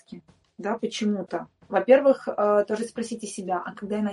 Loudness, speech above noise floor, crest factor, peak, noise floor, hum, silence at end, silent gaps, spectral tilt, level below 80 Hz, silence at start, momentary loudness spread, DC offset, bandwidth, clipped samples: -25 LUFS; 22 dB; 20 dB; -4 dBFS; -46 dBFS; none; 0 s; none; -5.5 dB/octave; -70 dBFS; 0.1 s; 14 LU; under 0.1%; 11.5 kHz; under 0.1%